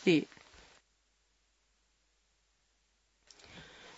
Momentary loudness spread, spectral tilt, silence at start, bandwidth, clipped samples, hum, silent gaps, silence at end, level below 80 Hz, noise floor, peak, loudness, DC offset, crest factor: 27 LU; -4.5 dB/octave; 0.05 s; 7.6 kHz; under 0.1%; none; none; 0.35 s; -74 dBFS; -75 dBFS; -16 dBFS; -33 LUFS; under 0.1%; 24 dB